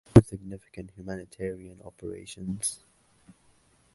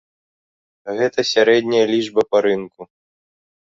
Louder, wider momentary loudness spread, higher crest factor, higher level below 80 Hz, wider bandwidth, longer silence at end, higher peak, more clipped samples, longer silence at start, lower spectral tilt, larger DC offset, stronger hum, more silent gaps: second, -30 LUFS vs -17 LUFS; first, 19 LU vs 14 LU; first, 28 dB vs 18 dB; first, -44 dBFS vs -64 dBFS; first, 11.5 kHz vs 7.6 kHz; first, 1.2 s vs 0.95 s; about the same, 0 dBFS vs -2 dBFS; neither; second, 0.15 s vs 0.85 s; first, -6.5 dB/octave vs -4 dB/octave; neither; neither; neither